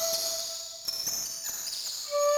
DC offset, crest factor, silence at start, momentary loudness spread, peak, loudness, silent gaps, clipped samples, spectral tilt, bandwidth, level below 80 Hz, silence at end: under 0.1%; 16 dB; 0 s; 5 LU; -16 dBFS; -31 LUFS; none; under 0.1%; 1.5 dB/octave; 16 kHz; -68 dBFS; 0 s